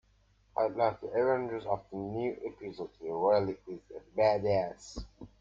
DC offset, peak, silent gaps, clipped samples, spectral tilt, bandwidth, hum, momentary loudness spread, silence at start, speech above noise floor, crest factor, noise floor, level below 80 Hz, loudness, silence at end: under 0.1%; -14 dBFS; none; under 0.1%; -6.5 dB/octave; 7.6 kHz; none; 17 LU; 0.55 s; 35 dB; 18 dB; -67 dBFS; -58 dBFS; -32 LUFS; 0.15 s